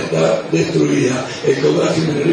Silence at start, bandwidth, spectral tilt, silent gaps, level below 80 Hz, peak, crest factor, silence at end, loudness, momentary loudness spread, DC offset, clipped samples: 0 s; 10.5 kHz; -5.5 dB/octave; none; -52 dBFS; -2 dBFS; 12 dB; 0 s; -16 LUFS; 3 LU; under 0.1%; under 0.1%